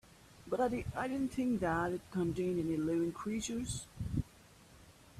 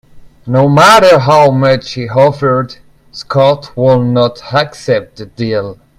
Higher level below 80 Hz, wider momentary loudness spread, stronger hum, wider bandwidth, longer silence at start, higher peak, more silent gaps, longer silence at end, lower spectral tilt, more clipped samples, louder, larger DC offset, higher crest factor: second, -56 dBFS vs -44 dBFS; second, 7 LU vs 12 LU; neither; second, 14.5 kHz vs 16 kHz; first, 0.3 s vs 0.15 s; second, -20 dBFS vs 0 dBFS; neither; second, 0 s vs 0.25 s; about the same, -6 dB/octave vs -6 dB/octave; second, under 0.1% vs 0.7%; second, -37 LUFS vs -10 LUFS; neither; first, 16 dB vs 10 dB